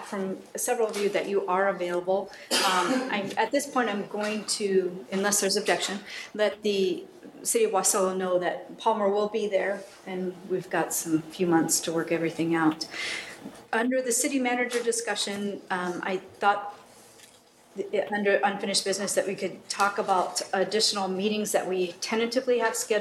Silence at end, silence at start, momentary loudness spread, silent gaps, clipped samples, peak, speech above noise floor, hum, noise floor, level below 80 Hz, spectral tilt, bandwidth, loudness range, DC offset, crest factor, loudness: 0 s; 0 s; 9 LU; none; under 0.1%; -8 dBFS; 29 dB; none; -56 dBFS; -74 dBFS; -3 dB/octave; 14 kHz; 2 LU; under 0.1%; 18 dB; -27 LUFS